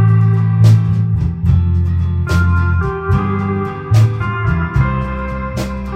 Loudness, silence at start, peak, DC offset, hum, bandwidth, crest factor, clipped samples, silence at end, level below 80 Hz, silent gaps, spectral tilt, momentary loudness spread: -15 LUFS; 0 s; 0 dBFS; under 0.1%; none; 8.8 kHz; 14 dB; under 0.1%; 0 s; -24 dBFS; none; -8.5 dB/octave; 10 LU